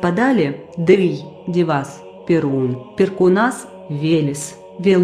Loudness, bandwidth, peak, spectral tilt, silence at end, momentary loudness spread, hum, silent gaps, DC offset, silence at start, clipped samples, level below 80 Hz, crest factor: -18 LUFS; 13.5 kHz; -2 dBFS; -6.5 dB/octave; 0 s; 14 LU; none; none; under 0.1%; 0 s; under 0.1%; -58 dBFS; 16 dB